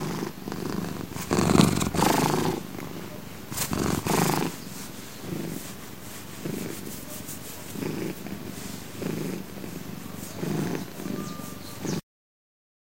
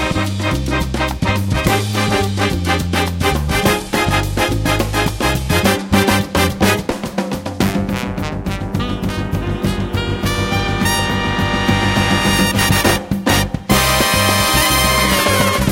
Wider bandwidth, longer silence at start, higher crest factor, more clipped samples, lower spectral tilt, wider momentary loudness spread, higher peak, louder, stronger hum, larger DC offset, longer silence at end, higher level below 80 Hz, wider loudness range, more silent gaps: about the same, 16 kHz vs 17 kHz; about the same, 0 s vs 0 s; first, 26 dB vs 16 dB; neither; about the same, -5 dB/octave vs -4 dB/octave; first, 15 LU vs 8 LU; second, -4 dBFS vs 0 dBFS; second, -29 LUFS vs -16 LUFS; neither; first, 0.6% vs under 0.1%; first, 0.95 s vs 0 s; second, -50 dBFS vs -28 dBFS; first, 10 LU vs 6 LU; neither